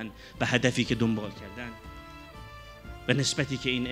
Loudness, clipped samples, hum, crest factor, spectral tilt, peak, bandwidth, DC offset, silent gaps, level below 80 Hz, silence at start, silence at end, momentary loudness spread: -28 LUFS; under 0.1%; none; 24 dB; -4.5 dB/octave; -6 dBFS; 15.5 kHz; under 0.1%; none; -50 dBFS; 0 s; 0 s; 20 LU